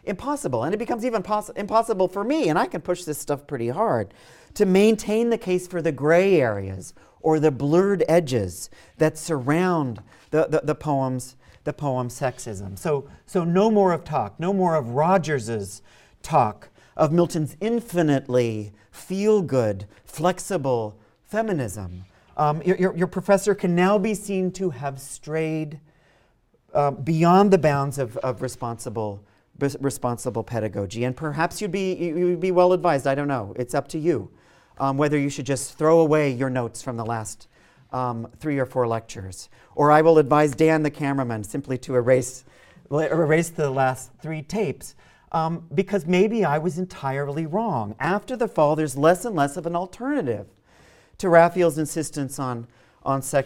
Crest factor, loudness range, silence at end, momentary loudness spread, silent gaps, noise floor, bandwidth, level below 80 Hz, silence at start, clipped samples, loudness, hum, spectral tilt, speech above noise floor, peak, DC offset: 20 dB; 4 LU; 0 s; 14 LU; none; -62 dBFS; 16.5 kHz; -56 dBFS; 0.05 s; under 0.1%; -23 LUFS; none; -6.5 dB/octave; 40 dB; -2 dBFS; under 0.1%